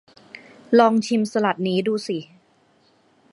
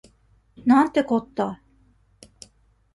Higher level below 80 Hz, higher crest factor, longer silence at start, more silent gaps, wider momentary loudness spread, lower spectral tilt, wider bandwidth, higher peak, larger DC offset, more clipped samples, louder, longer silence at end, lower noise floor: second, -72 dBFS vs -60 dBFS; about the same, 20 dB vs 20 dB; second, 0.35 s vs 0.65 s; neither; first, 14 LU vs 11 LU; about the same, -5.5 dB/octave vs -6 dB/octave; about the same, 11.5 kHz vs 11.5 kHz; first, -2 dBFS vs -6 dBFS; neither; neither; about the same, -21 LUFS vs -22 LUFS; second, 1.1 s vs 1.4 s; about the same, -60 dBFS vs -60 dBFS